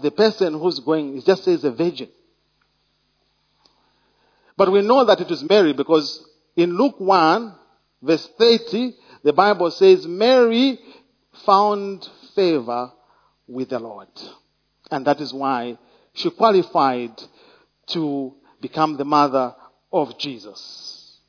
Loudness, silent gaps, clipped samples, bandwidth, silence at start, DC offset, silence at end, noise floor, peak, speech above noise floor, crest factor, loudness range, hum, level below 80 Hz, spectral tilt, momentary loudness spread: -19 LUFS; none; under 0.1%; 5.4 kHz; 0 s; under 0.1%; 0.35 s; -66 dBFS; 0 dBFS; 48 dB; 20 dB; 9 LU; none; -70 dBFS; -5.5 dB/octave; 19 LU